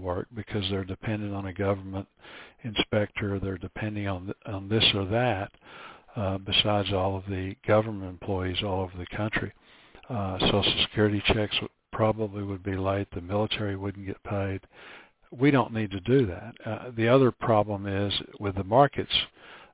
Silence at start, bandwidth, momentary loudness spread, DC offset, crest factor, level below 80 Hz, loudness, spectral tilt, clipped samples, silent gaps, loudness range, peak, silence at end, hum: 0 s; 4 kHz; 15 LU; under 0.1%; 22 dB; -46 dBFS; -27 LUFS; -10 dB/octave; under 0.1%; none; 6 LU; -6 dBFS; 0.1 s; none